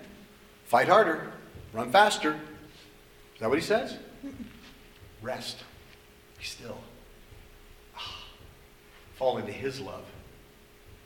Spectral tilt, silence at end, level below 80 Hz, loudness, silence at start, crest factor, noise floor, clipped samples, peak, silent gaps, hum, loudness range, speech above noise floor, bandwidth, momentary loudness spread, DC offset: -4 dB/octave; 0.1 s; -58 dBFS; -28 LUFS; 0 s; 24 dB; -55 dBFS; under 0.1%; -6 dBFS; none; none; 16 LU; 27 dB; 19 kHz; 27 LU; under 0.1%